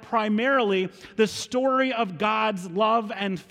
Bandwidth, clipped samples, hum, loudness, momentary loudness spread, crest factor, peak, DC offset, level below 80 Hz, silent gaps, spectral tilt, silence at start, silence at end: 15.5 kHz; under 0.1%; none; -24 LUFS; 5 LU; 14 dB; -10 dBFS; under 0.1%; -66 dBFS; none; -4.5 dB/octave; 0 s; 0.1 s